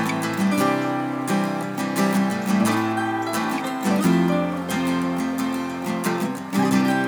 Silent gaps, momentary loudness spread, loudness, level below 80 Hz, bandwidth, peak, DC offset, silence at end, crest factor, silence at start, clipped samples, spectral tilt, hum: none; 6 LU; -22 LUFS; -64 dBFS; over 20 kHz; -8 dBFS; under 0.1%; 0 s; 14 dB; 0 s; under 0.1%; -5.5 dB/octave; none